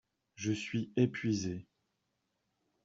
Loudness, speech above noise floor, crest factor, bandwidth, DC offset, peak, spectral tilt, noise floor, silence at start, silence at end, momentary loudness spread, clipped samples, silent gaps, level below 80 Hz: -35 LUFS; 49 dB; 20 dB; 7.8 kHz; under 0.1%; -16 dBFS; -6.5 dB/octave; -83 dBFS; 0.4 s; 1.2 s; 9 LU; under 0.1%; none; -70 dBFS